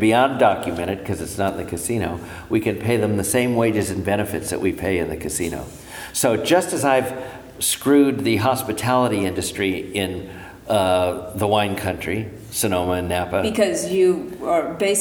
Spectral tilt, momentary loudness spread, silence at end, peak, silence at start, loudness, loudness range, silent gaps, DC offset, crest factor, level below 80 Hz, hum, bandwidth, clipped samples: -4.5 dB/octave; 10 LU; 0 s; -2 dBFS; 0 s; -21 LUFS; 3 LU; none; under 0.1%; 18 dB; -46 dBFS; none; over 20 kHz; under 0.1%